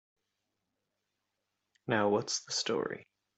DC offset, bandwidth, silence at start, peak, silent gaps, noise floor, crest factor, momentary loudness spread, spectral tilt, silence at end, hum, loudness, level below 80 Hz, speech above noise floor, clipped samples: under 0.1%; 8.2 kHz; 1.85 s; -14 dBFS; none; -85 dBFS; 22 dB; 14 LU; -3 dB/octave; 0.35 s; none; -32 LUFS; -78 dBFS; 53 dB; under 0.1%